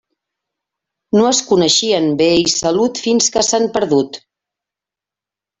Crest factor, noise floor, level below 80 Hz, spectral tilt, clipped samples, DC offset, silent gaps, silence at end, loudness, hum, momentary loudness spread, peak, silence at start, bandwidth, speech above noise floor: 16 dB; -87 dBFS; -54 dBFS; -3 dB/octave; under 0.1%; under 0.1%; none; 1.4 s; -14 LUFS; none; 5 LU; -2 dBFS; 1.15 s; 8.4 kHz; 73 dB